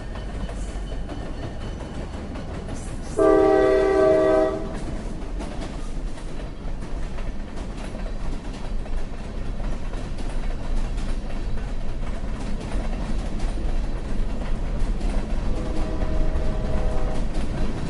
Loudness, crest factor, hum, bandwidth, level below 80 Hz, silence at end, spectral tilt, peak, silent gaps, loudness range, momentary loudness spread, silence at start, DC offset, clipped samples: -27 LUFS; 18 dB; none; 11.5 kHz; -26 dBFS; 0 s; -7 dB/octave; -6 dBFS; none; 13 LU; 16 LU; 0 s; under 0.1%; under 0.1%